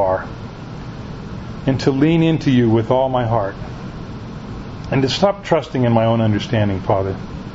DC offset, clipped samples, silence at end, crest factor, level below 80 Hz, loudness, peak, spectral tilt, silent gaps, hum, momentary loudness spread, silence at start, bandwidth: under 0.1%; under 0.1%; 0 s; 18 dB; -38 dBFS; -17 LUFS; 0 dBFS; -7.5 dB/octave; none; none; 16 LU; 0 s; 7.8 kHz